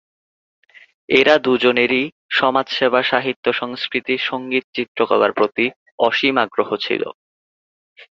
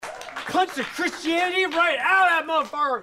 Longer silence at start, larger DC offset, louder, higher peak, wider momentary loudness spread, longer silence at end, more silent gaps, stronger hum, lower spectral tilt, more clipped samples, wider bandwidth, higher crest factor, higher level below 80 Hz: first, 1.1 s vs 0 s; neither; first, -18 LUFS vs -22 LUFS; first, 0 dBFS vs -10 dBFS; about the same, 8 LU vs 8 LU; first, 0.15 s vs 0 s; first, 2.12-2.29 s, 3.36-3.43 s, 4.64-4.73 s, 4.88-4.95 s, 5.76-5.86 s, 5.92-5.98 s, 7.14-7.96 s vs none; neither; first, -5 dB/octave vs -2 dB/octave; neither; second, 7.4 kHz vs 16 kHz; about the same, 18 dB vs 14 dB; about the same, -62 dBFS vs -64 dBFS